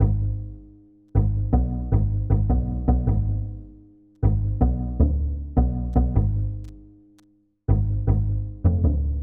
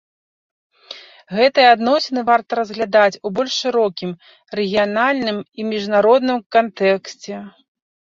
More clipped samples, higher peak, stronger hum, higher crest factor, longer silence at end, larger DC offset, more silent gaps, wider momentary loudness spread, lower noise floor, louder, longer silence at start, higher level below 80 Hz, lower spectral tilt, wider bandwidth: neither; second, -6 dBFS vs -2 dBFS; first, 50 Hz at -40 dBFS vs none; about the same, 16 dB vs 16 dB; second, 0 s vs 0.7 s; first, 0.1% vs under 0.1%; second, none vs 6.46-6.50 s; second, 8 LU vs 18 LU; first, -60 dBFS vs -40 dBFS; second, -24 LUFS vs -17 LUFS; second, 0 s vs 0.9 s; first, -26 dBFS vs -64 dBFS; first, -13 dB/octave vs -4.5 dB/octave; second, 2.1 kHz vs 7.6 kHz